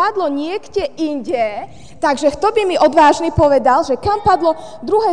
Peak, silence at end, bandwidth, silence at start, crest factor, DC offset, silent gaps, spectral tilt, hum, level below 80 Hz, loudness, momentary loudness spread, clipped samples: -2 dBFS; 0 s; 10 kHz; 0 s; 14 dB; 1%; none; -5.5 dB/octave; none; -40 dBFS; -15 LUFS; 10 LU; under 0.1%